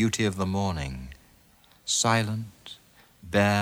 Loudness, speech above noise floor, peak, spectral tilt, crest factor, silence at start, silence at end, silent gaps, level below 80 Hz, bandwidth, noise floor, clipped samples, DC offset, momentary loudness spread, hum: -26 LUFS; 33 dB; -6 dBFS; -4 dB/octave; 20 dB; 0 s; 0 s; none; -48 dBFS; over 20 kHz; -59 dBFS; under 0.1%; under 0.1%; 22 LU; none